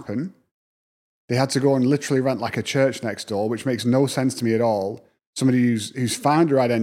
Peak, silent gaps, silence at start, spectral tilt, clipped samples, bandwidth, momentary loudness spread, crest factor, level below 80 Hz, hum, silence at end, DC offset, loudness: -4 dBFS; 0.51-1.28 s, 5.27-5.33 s; 0 s; -5.5 dB/octave; under 0.1%; 15.5 kHz; 10 LU; 18 dB; -68 dBFS; none; 0 s; under 0.1%; -22 LUFS